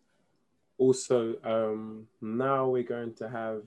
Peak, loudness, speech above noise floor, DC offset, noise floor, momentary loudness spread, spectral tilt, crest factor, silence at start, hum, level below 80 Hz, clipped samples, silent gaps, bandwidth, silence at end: -12 dBFS; -30 LUFS; 46 dB; under 0.1%; -75 dBFS; 11 LU; -6 dB/octave; 18 dB; 0.8 s; none; -78 dBFS; under 0.1%; none; 11.5 kHz; 0 s